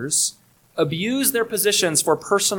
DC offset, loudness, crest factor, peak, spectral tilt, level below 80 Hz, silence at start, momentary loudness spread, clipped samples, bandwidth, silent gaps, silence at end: under 0.1%; -20 LUFS; 18 dB; -2 dBFS; -2.5 dB/octave; -62 dBFS; 0 s; 6 LU; under 0.1%; 19 kHz; none; 0 s